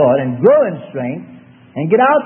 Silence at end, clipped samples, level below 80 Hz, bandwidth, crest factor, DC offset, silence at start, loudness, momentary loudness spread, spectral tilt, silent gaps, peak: 0 s; under 0.1%; -62 dBFS; 3.4 kHz; 14 dB; under 0.1%; 0 s; -15 LUFS; 15 LU; -11 dB/octave; none; 0 dBFS